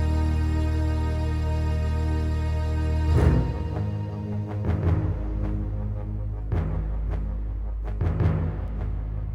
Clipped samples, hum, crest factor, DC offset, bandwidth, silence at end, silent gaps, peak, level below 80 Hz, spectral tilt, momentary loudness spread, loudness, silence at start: under 0.1%; none; 16 dB; under 0.1%; 10 kHz; 0 s; none; -8 dBFS; -28 dBFS; -8.5 dB/octave; 8 LU; -27 LUFS; 0 s